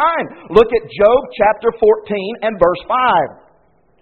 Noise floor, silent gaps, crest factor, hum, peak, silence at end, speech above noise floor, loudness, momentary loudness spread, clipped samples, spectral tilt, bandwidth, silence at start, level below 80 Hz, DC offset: -56 dBFS; none; 14 dB; none; 0 dBFS; 0.75 s; 41 dB; -15 LUFS; 8 LU; under 0.1%; -3 dB/octave; 4.5 kHz; 0 s; -42 dBFS; 0.1%